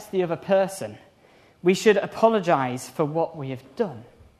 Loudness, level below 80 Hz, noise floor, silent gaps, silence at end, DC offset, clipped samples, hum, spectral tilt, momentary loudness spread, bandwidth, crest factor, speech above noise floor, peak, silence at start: -23 LUFS; -66 dBFS; -56 dBFS; none; 0.35 s; under 0.1%; under 0.1%; none; -5.5 dB/octave; 15 LU; 13.5 kHz; 20 dB; 32 dB; -4 dBFS; 0 s